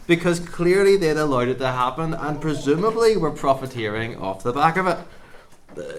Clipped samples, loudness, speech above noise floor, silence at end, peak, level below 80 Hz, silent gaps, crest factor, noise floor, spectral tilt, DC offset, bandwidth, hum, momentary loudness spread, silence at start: under 0.1%; -21 LUFS; 24 dB; 0 s; -4 dBFS; -42 dBFS; none; 18 dB; -44 dBFS; -6 dB/octave; under 0.1%; 14.5 kHz; none; 10 LU; 0 s